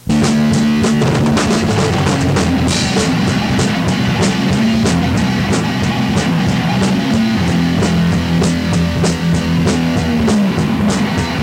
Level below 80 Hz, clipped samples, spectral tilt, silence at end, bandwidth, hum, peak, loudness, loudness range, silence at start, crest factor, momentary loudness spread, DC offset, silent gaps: -32 dBFS; under 0.1%; -5.5 dB/octave; 0 s; 16 kHz; none; 0 dBFS; -14 LUFS; 1 LU; 0.05 s; 12 dB; 2 LU; under 0.1%; none